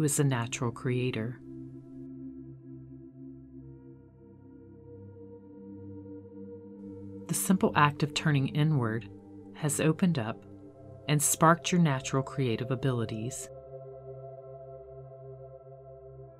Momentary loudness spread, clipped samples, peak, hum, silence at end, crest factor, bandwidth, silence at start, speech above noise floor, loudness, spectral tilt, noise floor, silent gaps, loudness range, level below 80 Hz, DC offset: 23 LU; under 0.1%; -8 dBFS; none; 0.05 s; 24 dB; 16 kHz; 0 s; 25 dB; -29 LUFS; -5 dB/octave; -53 dBFS; none; 20 LU; -64 dBFS; under 0.1%